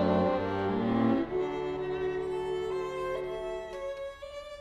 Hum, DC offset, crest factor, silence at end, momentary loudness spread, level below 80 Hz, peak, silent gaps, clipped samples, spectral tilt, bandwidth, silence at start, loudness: none; under 0.1%; 16 dB; 0 s; 11 LU; -54 dBFS; -16 dBFS; none; under 0.1%; -7.5 dB/octave; 11 kHz; 0 s; -32 LUFS